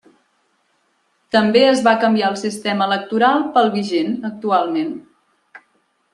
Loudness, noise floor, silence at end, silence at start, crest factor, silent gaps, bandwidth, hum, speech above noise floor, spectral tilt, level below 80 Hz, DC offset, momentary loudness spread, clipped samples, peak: -17 LUFS; -64 dBFS; 0.55 s; 1.35 s; 16 dB; none; 12 kHz; none; 48 dB; -5 dB/octave; -66 dBFS; under 0.1%; 10 LU; under 0.1%; -2 dBFS